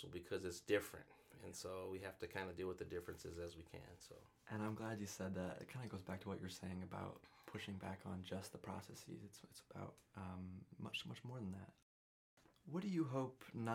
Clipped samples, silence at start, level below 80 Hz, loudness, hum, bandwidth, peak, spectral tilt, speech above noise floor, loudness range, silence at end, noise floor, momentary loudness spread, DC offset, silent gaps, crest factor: under 0.1%; 0 s; -74 dBFS; -49 LUFS; none; 18 kHz; -26 dBFS; -5.5 dB/octave; over 41 dB; 5 LU; 0 s; under -90 dBFS; 15 LU; under 0.1%; 11.82-12.37 s; 24 dB